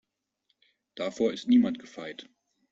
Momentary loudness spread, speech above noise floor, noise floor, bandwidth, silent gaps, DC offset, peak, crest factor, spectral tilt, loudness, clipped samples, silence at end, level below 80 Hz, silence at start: 20 LU; 50 dB; -77 dBFS; 7.6 kHz; none; under 0.1%; -12 dBFS; 18 dB; -5.5 dB/octave; -27 LUFS; under 0.1%; 0.5 s; -72 dBFS; 0.95 s